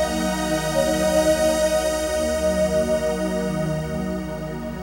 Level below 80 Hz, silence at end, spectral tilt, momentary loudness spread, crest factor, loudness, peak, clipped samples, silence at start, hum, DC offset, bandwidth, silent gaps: -36 dBFS; 0 s; -4.5 dB/octave; 8 LU; 14 dB; -22 LUFS; -8 dBFS; under 0.1%; 0 s; none; under 0.1%; 16.5 kHz; none